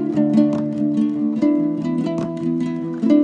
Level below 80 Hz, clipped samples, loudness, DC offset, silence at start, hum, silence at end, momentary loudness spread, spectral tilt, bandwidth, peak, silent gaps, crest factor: -58 dBFS; under 0.1%; -20 LUFS; under 0.1%; 0 s; none; 0 s; 6 LU; -9 dB/octave; 7.6 kHz; -4 dBFS; none; 14 dB